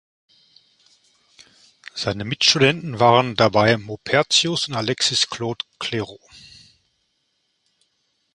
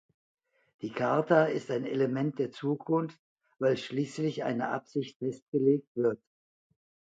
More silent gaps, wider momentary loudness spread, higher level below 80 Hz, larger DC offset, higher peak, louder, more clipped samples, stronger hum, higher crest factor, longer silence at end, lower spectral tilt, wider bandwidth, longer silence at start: second, none vs 3.19-3.36 s, 5.16-5.20 s, 5.42-5.52 s, 5.87-5.95 s; about the same, 12 LU vs 11 LU; first, -56 dBFS vs -78 dBFS; neither; first, 0 dBFS vs -10 dBFS; first, -19 LUFS vs -31 LUFS; neither; neither; about the same, 22 dB vs 22 dB; first, 2.2 s vs 0.95 s; second, -3.5 dB/octave vs -7 dB/octave; first, 11.5 kHz vs 9 kHz; first, 1.95 s vs 0.8 s